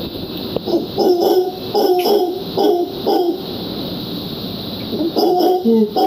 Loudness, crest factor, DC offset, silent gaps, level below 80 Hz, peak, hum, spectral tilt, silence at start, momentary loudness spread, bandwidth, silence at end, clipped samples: -17 LUFS; 16 dB; under 0.1%; none; -48 dBFS; -2 dBFS; none; -6 dB/octave; 0 s; 10 LU; 16 kHz; 0 s; under 0.1%